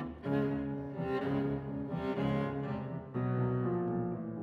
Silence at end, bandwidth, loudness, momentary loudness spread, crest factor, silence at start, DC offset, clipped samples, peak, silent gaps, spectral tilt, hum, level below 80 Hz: 0 s; 5.6 kHz; -35 LUFS; 6 LU; 16 dB; 0 s; under 0.1%; under 0.1%; -20 dBFS; none; -10 dB/octave; none; -56 dBFS